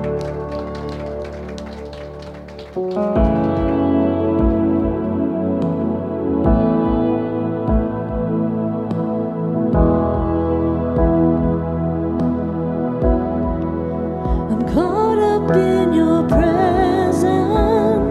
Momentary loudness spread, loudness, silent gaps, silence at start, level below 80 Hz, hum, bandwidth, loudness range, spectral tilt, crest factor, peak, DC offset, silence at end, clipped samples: 11 LU; -18 LUFS; none; 0 s; -28 dBFS; none; 12 kHz; 4 LU; -8.5 dB/octave; 16 dB; -2 dBFS; under 0.1%; 0 s; under 0.1%